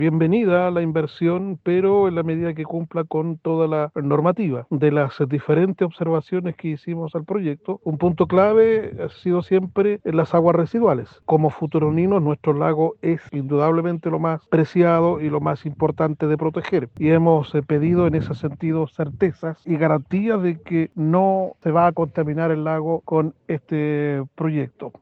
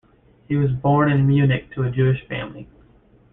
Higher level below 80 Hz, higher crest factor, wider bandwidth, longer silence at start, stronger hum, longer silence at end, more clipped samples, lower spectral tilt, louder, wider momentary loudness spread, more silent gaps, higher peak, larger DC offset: second, -58 dBFS vs -48 dBFS; about the same, 16 dB vs 14 dB; first, 4.9 kHz vs 3.8 kHz; second, 0 s vs 0.5 s; neither; second, 0.1 s vs 0.7 s; neither; about the same, -10.5 dB/octave vs -11.5 dB/octave; about the same, -20 LUFS vs -20 LUFS; second, 8 LU vs 12 LU; neither; first, -4 dBFS vs -8 dBFS; neither